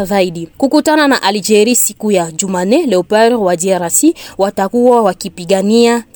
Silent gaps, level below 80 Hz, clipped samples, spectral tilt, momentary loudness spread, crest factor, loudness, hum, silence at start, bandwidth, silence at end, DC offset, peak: none; -50 dBFS; under 0.1%; -3.5 dB/octave; 7 LU; 12 dB; -12 LUFS; none; 0 s; over 20 kHz; 0.15 s; under 0.1%; 0 dBFS